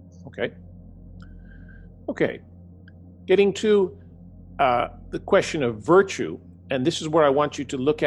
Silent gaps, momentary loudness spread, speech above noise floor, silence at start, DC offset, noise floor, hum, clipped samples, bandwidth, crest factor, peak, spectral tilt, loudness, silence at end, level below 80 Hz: none; 17 LU; 24 dB; 0.15 s; under 0.1%; -46 dBFS; none; under 0.1%; 11.5 kHz; 18 dB; -6 dBFS; -5.5 dB/octave; -22 LUFS; 0 s; -50 dBFS